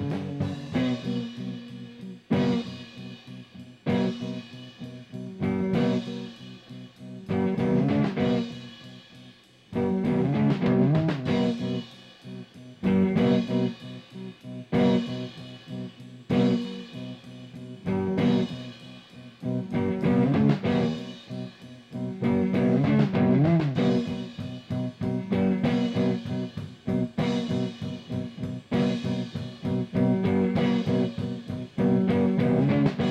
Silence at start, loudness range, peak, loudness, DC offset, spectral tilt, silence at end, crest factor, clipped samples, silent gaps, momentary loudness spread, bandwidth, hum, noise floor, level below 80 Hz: 0 s; 6 LU; -10 dBFS; -26 LUFS; under 0.1%; -8 dB/octave; 0 s; 16 dB; under 0.1%; none; 19 LU; 8.4 kHz; none; -52 dBFS; -58 dBFS